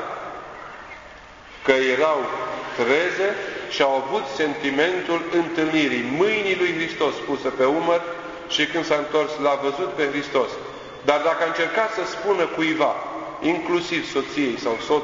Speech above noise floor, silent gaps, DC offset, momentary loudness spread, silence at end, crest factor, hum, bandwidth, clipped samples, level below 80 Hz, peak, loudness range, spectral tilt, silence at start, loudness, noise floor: 21 dB; none; under 0.1%; 12 LU; 0 s; 20 dB; none; 7.6 kHz; under 0.1%; -58 dBFS; -2 dBFS; 1 LU; -4 dB/octave; 0 s; -22 LUFS; -43 dBFS